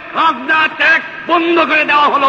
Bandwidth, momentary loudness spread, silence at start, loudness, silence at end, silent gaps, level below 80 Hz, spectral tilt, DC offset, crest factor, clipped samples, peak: 8 kHz; 4 LU; 0 s; -11 LUFS; 0 s; none; -56 dBFS; -4 dB/octave; under 0.1%; 12 dB; under 0.1%; -2 dBFS